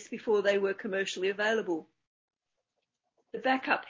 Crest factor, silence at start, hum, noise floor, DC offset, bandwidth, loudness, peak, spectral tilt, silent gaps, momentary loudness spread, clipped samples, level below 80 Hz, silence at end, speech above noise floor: 20 dB; 0 s; none; -84 dBFS; under 0.1%; 7.8 kHz; -30 LUFS; -12 dBFS; -4 dB/octave; 2.07-2.28 s; 8 LU; under 0.1%; -80 dBFS; 0 s; 54 dB